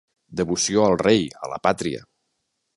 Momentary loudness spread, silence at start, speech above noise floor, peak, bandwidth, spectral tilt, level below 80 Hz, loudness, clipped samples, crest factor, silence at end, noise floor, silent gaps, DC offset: 12 LU; 0.3 s; 54 dB; -4 dBFS; 11.5 kHz; -4 dB/octave; -52 dBFS; -21 LUFS; under 0.1%; 20 dB; 0.75 s; -75 dBFS; none; under 0.1%